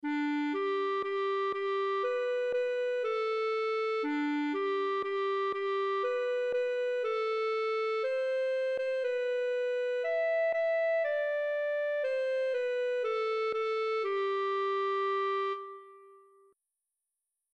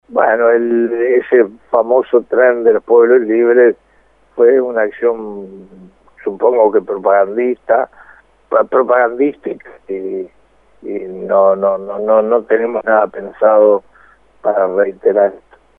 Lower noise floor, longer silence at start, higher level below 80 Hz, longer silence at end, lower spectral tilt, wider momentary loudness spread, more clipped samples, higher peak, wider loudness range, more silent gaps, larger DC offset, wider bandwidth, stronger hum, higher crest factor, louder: first, -87 dBFS vs -52 dBFS; about the same, 0.05 s vs 0.1 s; second, -84 dBFS vs -58 dBFS; first, 1.4 s vs 0.4 s; second, -3.5 dB/octave vs -9 dB/octave; second, 2 LU vs 15 LU; neither; second, -22 dBFS vs 0 dBFS; second, 1 LU vs 5 LU; neither; neither; first, 8.4 kHz vs 3.6 kHz; neither; about the same, 10 dB vs 14 dB; second, -31 LUFS vs -13 LUFS